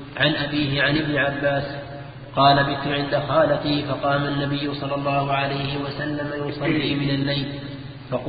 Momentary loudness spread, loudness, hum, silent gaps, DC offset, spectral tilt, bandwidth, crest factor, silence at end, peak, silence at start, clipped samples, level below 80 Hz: 11 LU; -22 LUFS; none; none; under 0.1%; -11 dB/octave; 5 kHz; 18 dB; 0 s; -4 dBFS; 0 s; under 0.1%; -48 dBFS